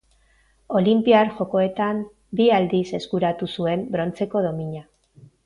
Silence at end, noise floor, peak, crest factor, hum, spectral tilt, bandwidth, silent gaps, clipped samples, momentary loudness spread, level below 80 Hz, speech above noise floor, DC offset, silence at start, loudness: 0.65 s; -60 dBFS; -4 dBFS; 18 dB; none; -7.5 dB/octave; 10.5 kHz; none; under 0.1%; 11 LU; -58 dBFS; 39 dB; under 0.1%; 0.7 s; -22 LUFS